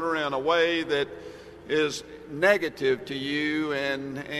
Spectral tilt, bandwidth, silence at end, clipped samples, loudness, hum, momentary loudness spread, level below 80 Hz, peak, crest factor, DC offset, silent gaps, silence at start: -4 dB/octave; 13.5 kHz; 0 s; under 0.1%; -26 LUFS; none; 14 LU; -60 dBFS; -8 dBFS; 20 dB; under 0.1%; none; 0 s